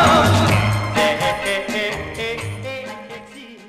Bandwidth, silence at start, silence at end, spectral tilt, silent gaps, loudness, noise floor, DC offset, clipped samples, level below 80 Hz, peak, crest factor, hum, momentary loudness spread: 16 kHz; 0 s; 0 s; -5 dB/octave; none; -19 LUFS; -39 dBFS; under 0.1%; under 0.1%; -40 dBFS; -4 dBFS; 16 dB; none; 19 LU